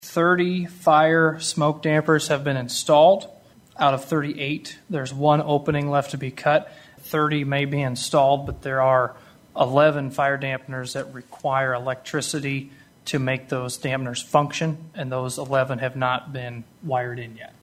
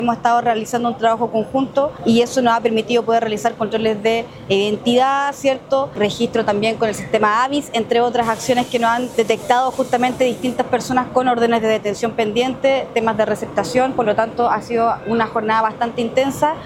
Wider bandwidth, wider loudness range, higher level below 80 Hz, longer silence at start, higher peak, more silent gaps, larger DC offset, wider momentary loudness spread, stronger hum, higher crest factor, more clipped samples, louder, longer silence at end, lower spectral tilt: about the same, 16 kHz vs 16.5 kHz; first, 6 LU vs 1 LU; about the same, -56 dBFS vs -52 dBFS; about the same, 0 s vs 0 s; about the same, -2 dBFS vs 0 dBFS; neither; neither; first, 13 LU vs 4 LU; neither; about the same, 20 dB vs 16 dB; neither; second, -22 LUFS vs -18 LUFS; first, 0.15 s vs 0 s; about the same, -5 dB/octave vs -4.5 dB/octave